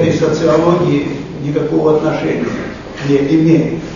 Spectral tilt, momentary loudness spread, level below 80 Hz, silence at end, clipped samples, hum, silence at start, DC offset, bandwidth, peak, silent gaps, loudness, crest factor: -7.5 dB/octave; 11 LU; -40 dBFS; 0 s; under 0.1%; none; 0 s; under 0.1%; 7.4 kHz; 0 dBFS; none; -14 LUFS; 14 dB